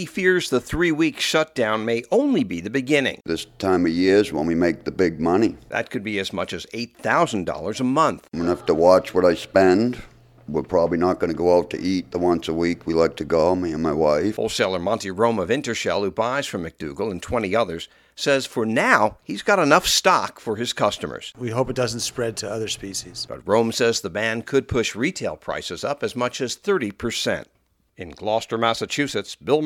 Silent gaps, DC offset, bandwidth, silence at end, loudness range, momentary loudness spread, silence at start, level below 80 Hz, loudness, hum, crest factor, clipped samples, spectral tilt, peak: none; under 0.1%; 17 kHz; 0 s; 5 LU; 11 LU; 0 s; -48 dBFS; -22 LUFS; none; 20 dB; under 0.1%; -4.5 dB/octave; 0 dBFS